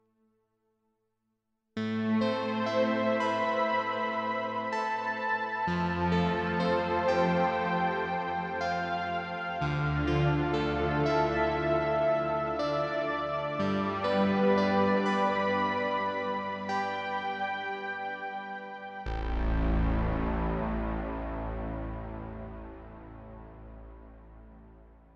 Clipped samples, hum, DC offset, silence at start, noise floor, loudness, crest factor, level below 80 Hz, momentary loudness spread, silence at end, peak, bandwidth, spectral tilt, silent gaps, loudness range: under 0.1%; none; under 0.1%; 1.75 s; -80 dBFS; -30 LUFS; 16 dB; -42 dBFS; 13 LU; 0.25 s; -14 dBFS; 8.4 kHz; -7 dB/octave; none; 7 LU